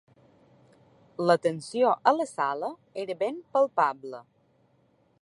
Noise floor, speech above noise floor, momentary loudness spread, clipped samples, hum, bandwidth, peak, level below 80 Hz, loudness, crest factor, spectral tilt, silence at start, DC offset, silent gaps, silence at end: -66 dBFS; 39 dB; 16 LU; under 0.1%; none; 11.5 kHz; -6 dBFS; -80 dBFS; -27 LUFS; 22 dB; -5.5 dB/octave; 1.2 s; under 0.1%; none; 1 s